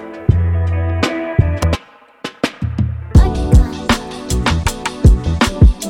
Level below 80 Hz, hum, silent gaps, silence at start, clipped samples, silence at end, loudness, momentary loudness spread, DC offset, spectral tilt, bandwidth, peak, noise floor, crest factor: -18 dBFS; none; none; 0 s; under 0.1%; 0 s; -16 LUFS; 9 LU; under 0.1%; -6 dB/octave; 15.5 kHz; 0 dBFS; -35 dBFS; 14 dB